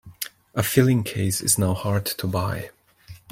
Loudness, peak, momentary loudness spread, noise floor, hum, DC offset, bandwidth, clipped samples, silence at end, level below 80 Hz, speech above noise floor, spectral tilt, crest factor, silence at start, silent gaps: -23 LUFS; -2 dBFS; 14 LU; -46 dBFS; none; under 0.1%; 16.5 kHz; under 0.1%; 0.15 s; -52 dBFS; 24 dB; -4.5 dB/octave; 20 dB; 0.05 s; none